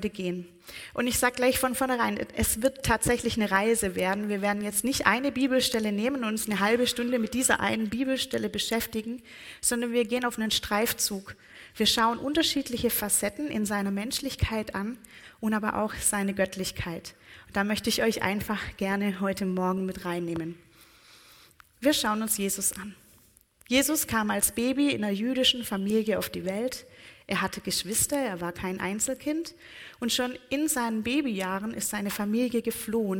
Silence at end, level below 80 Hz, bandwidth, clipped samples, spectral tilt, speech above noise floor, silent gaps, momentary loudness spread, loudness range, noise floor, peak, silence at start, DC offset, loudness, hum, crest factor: 0 s; -50 dBFS; 17 kHz; under 0.1%; -3 dB/octave; 32 dB; none; 10 LU; 4 LU; -60 dBFS; -4 dBFS; 0 s; under 0.1%; -27 LUFS; none; 24 dB